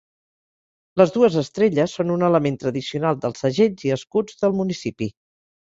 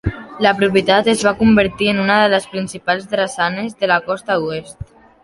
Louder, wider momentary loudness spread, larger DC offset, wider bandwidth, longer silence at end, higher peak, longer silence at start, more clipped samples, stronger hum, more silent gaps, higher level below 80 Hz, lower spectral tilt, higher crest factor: second, -21 LUFS vs -16 LUFS; second, 8 LU vs 12 LU; neither; second, 7.8 kHz vs 11.5 kHz; about the same, 0.5 s vs 0.4 s; about the same, -2 dBFS vs 0 dBFS; first, 0.95 s vs 0.05 s; neither; neither; neither; second, -60 dBFS vs -40 dBFS; first, -6.5 dB/octave vs -5 dB/octave; about the same, 20 dB vs 16 dB